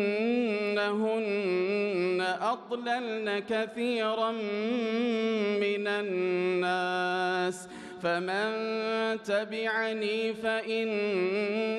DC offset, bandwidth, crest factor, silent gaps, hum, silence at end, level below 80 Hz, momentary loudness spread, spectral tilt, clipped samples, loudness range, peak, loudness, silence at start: under 0.1%; 12 kHz; 12 dB; none; none; 0 s; -78 dBFS; 3 LU; -5 dB/octave; under 0.1%; 1 LU; -16 dBFS; -30 LUFS; 0 s